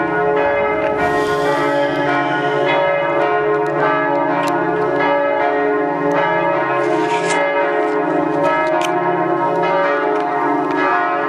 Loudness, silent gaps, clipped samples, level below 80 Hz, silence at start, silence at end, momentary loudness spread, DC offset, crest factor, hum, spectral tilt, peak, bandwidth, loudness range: -16 LUFS; none; under 0.1%; -52 dBFS; 0 s; 0 s; 2 LU; under 0.1%; 14 dB; none; -5.5 dB/octave; -2 dBFS; 13 kHz; 0 LU